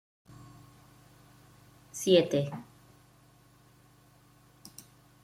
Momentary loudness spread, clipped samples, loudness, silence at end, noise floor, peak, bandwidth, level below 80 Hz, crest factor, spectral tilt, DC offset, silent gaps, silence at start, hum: 29 LU; under 0.1%; -27 LUFS; 2.6 s; -61 dBFS; -10 dBFS; 16 kHz; -70 dBFS; 26 dB; -5 dB/octave; under 0.1%; none; 1.95 s; 50 Hz at -65 dBFS